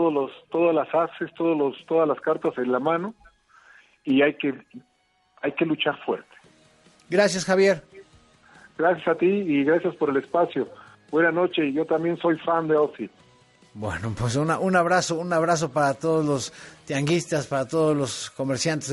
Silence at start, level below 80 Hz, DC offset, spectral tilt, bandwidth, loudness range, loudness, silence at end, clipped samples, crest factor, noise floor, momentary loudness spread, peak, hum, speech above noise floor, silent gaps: 0 s; -60 dBFS; under 0.1%; -5 dB/octave; 11.5 kHz; 4 LU; -24 LUFS; 0 s; under 0.1%; 18 dB; -62 dBFS; 9 LU; -6 dBFS; none; 39 dB; none